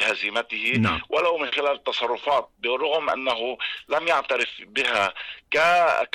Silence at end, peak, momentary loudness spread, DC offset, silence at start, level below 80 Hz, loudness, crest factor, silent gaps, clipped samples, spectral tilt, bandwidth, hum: 0.05 s; -12 dBFS; 6 LU; under 0.1%; 0 s; -56 dBFS; -23 LUFS; 12 dB; none; under 0.1%; -4 dB/octave; 13.5 kHz; none